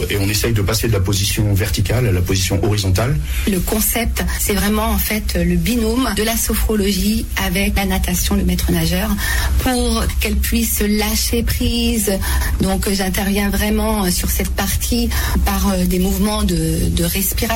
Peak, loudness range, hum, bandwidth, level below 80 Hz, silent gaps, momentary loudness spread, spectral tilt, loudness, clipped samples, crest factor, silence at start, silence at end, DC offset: -6 dBFS; 0 LU; none; 16.5 kHz; -22 dBFS; none; 2 LU; -4.5 dB/octave; -17 LUFS; under 0.1%; 10 dB; 0 s; 0 s; under 0.1%